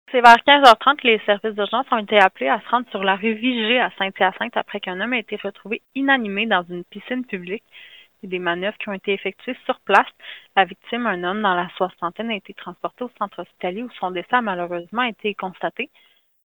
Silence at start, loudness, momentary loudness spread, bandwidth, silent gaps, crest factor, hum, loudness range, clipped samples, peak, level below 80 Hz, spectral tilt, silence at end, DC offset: 0.1 s; -20 LUFS; 14 LU; over 20 kHz; none; 20 dB; none; 7 LU; under 0.1%; 0 dBFS; -66 dBFS; -4.5 dB/octave; 0.65 s; under 0.1%